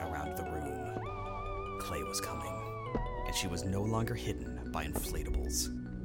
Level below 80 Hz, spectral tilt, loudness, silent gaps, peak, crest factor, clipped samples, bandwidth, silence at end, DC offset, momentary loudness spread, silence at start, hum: -44 dBFS; -4.5 dB/octave; -37 LUFS; none; -20 dBFS; 16 dB; under 0.1%; 17 kHz; 0 s; under 0.1%; 6 LU; 0 s; none